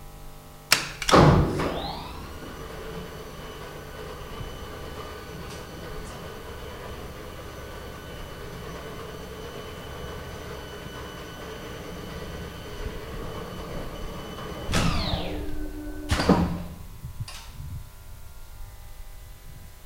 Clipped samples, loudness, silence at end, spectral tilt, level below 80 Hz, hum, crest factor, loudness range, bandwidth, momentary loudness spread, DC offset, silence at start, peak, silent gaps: under 0.1%; -30 LUFS; 0 s; -5 dB/octave; -38 dBFS; none; 26 dB; 14 LU; 16 kHz; 22 LU; under 0.1%; 0 s; -4 dBFS; none